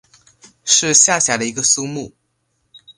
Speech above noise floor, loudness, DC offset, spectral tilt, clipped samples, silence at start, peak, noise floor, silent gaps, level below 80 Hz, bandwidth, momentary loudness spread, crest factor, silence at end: 52 dB; -13 LUFS; under 0.1%; -1 dB/octave; under 0.1%; 0.65 s; 0 dBFS; -68 dBFS; none; -60 dBFS; 11.5 kHz; 19 LU; 18 dB; 0.05 s